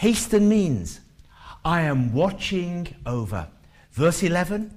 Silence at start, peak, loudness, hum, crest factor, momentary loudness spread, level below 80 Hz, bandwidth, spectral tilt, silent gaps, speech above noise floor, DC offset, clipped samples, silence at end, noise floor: 0 s; -8 dBFS; -23 LUFS; none; 16 dB; 14 LU; -44 dBFS; 15.5 kHz; -5.5 dB/octave; none; 24 dB; under 0.1%; under 0.1%; 0 s; -46 dBFS